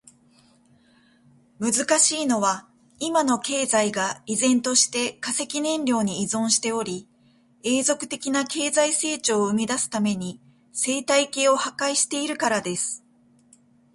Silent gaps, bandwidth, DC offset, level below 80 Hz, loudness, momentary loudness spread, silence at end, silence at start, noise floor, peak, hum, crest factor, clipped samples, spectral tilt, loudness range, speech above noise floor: none; 12 kHz; under 0.1%; -68 dBFS; -23 LUFS; 9 LU; 0.95 s; 1.6 s; -59 dBFS; -6 dBFS; none; 20 dB; under 0.1%; -2.5 dB/octave; 2 LU; 36 dB